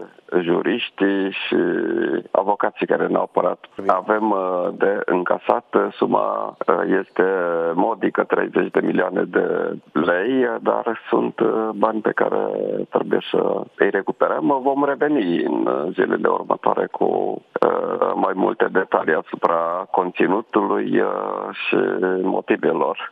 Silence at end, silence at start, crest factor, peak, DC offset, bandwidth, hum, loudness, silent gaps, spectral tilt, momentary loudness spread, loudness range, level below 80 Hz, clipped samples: 0 s; 0 s; 20 dB; 0 dBFS; under 0.1%; 4.9 kHz; none; -20 LUFS; none; -8.5 dB/octave; 3 LU; 1 LU; -70 dBFS; under 0.1%